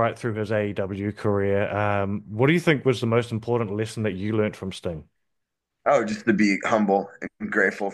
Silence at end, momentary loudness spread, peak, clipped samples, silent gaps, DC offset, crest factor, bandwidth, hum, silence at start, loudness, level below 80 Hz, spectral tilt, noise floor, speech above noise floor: 0 s; 8 LU; -6 dBFS; under 0.1%; none; under 0.1%; 18 dB; 12.5 kHz; none; 0 s; -24 LUFS; -60 dBFS; -6.5 dB/octave; -81 dBFS; 57 dB